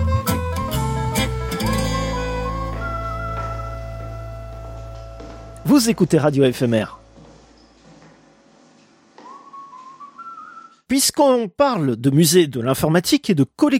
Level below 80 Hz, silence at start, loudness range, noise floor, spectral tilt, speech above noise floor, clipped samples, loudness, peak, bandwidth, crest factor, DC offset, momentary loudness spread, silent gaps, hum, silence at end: -34 dBFS; 0 s; 12 LU; -52 dBFS; -5 dB/octave; 36 dB; under 0.1%; -19 LUFS; -2 dBFS; 16.5 kHz; 18 dB; under 0.1%; 22 LU; none; none; 0 s